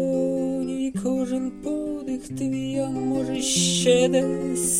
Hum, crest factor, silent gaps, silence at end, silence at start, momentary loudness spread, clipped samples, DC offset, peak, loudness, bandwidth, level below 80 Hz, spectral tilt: none; 16 dB; none; 0 s; 0 s; 10 LU; under 0.1%; under 0.1%; -8 dBFS; -24 LUFS; 16.5 kHz; -52 dBFS; -4 dB/octave